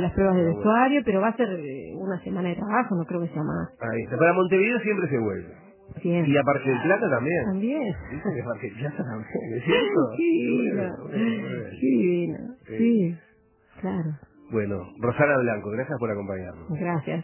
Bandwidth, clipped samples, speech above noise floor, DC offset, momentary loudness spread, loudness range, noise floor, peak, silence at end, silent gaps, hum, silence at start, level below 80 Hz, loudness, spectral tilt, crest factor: 3.2 kHz; under 0.1%; 33 dB; under 0.1%; 12 LU; 3 LU; -58 dBFS; -6 dBFS; 0 s; none; none; 0 s; -52 dBFS; -25 LUFS; -11 dB/octave; 18 dB